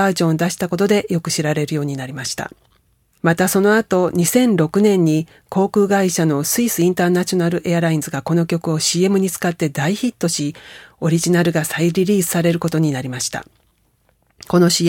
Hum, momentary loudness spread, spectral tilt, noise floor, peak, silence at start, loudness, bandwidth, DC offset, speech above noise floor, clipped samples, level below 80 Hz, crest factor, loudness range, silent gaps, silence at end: none; 8 LU; -5 dB/octave; -61 dBFS; 0 dBFS; 0 s; -17 LUFS; 18 kHz; under 0.1%; 44 dB; under 0.1%; -56 dBFS; 16 dB; 3 LU; none; 0 s